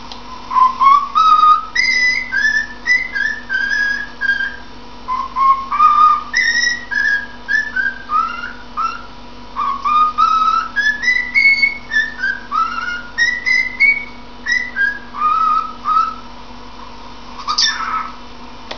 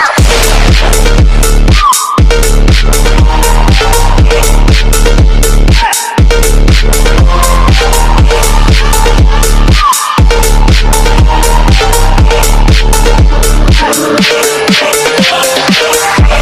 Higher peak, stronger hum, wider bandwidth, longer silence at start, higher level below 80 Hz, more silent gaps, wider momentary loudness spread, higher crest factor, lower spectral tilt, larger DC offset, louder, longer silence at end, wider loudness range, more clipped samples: about the same, 0 dBFS vs 0 dBFS; neither; second, 5.4 kHz vs 16 kHz; about the same, 0 s vs 0 s; second, -44 dBFS vs -6 dBFS; neither; first, 20 LU vs 2 LU; first, 16 dB vs 4 dB; second, -0.5 dB/octave vs -4 dB/octave; first, 2% vs under 0.1%; second, -14 LUFS vs -7 LUFS; about the same, 0 s vs 0 s; first, 5 LU vs 1 LU; second, under 0.1% vs 1%